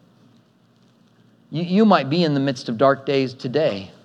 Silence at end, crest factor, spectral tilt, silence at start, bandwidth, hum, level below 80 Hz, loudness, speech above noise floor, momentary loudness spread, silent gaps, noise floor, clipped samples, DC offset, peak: 0.15 s; 20 dB; -7 dB/octave; 1.5 s; 9 kHz; none; -78 dBFS; -20 LUFS; 38 dB; 8 LU; none; -57 dBFS; under 0.1%; under 0.1%; -2 dBFS